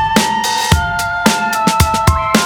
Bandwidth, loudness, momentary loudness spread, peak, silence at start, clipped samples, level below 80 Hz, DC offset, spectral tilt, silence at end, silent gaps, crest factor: over 20 kHz; -13 LUFS; 2 LU; 0 dBFS; 0 s; under 0.1%; -24 dBFS; under 0.1%; -4 dB/octave; 0 s; none; 14 dB